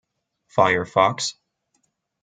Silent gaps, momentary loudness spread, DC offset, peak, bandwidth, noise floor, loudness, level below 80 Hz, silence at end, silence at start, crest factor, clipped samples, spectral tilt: none; 9 LU; under 0.1%; -2 dBFS; 9.6 kHz; -71 dBFS; -21 LUFS; -66 dBFS; 0.9 s; 0.55 s; 22 dB; under 0.1%; -3.5 dB/octave